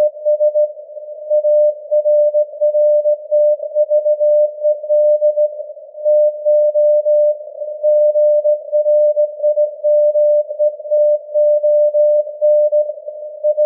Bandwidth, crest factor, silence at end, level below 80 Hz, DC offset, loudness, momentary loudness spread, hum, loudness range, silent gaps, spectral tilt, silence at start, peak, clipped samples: 0.8 kHz; 8 dB; 0 s; under -90 dBFS; under 0.1%; -14 LUFS; 7 LU; none; 1 LU; none; -9 dB/octave; 0 s; -6 dBFS; under 0.1%